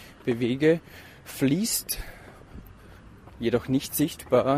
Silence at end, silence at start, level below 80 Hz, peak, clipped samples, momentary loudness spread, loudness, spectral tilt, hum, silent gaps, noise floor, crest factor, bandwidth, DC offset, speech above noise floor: 0 s; 0 s; -50 dBFS; -8 dBFS; under 0.1%; 23 LU; -26 LUFS; -5 dB/octave; none; none; -49 dBFS; 18 dB; 15.5 kHz; under 0.1%; 23 dB